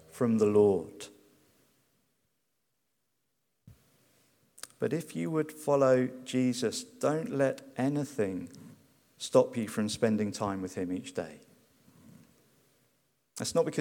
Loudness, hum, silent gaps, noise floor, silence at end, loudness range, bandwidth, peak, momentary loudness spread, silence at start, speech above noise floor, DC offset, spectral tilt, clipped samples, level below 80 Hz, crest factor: -30 LUFS; none; none; -81 dBFS; 0 s; 9 LU; 18.5 kHz; -10 dBFS; 16 LU; 0.15 s; 52 dB; under 0.1%; -5.5 dB/octave; under 0.1%; -74 dBFS; 22 dB